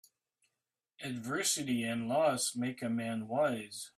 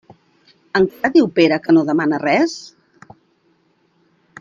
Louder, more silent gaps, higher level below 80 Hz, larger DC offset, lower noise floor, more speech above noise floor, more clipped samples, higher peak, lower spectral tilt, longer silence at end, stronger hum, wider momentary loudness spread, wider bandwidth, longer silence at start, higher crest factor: second, -34 LUFS vs -16 LUFS; neither; second, -76 dBFS vs -60 dBFS; neither; first, -89 dBFS vs -61 dBFS; first, 55 dB vs 45 dB; neither; second, -18 dBFS vs -2 dBFS; second, -3.5 dB/octave vs -6 dB/octave; second, 0.1 s vs 1.7 s; neither; about the same, 10 LU vs 8 LU; first, 15.5 kHz vs 7.4 kHz; first, 1 s vs 0.75 s; about the same, 18 dB vs 16 dB